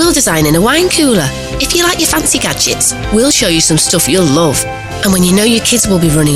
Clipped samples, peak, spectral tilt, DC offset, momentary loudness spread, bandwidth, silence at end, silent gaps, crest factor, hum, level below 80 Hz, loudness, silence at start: under 0.1%; 0 dBFS; -3.5 dB/octave; 0.6%; 4 LU; 16 kHz; 0 s; none; 10 dB; none; -28 dBFS; -9 LUFS; 0 s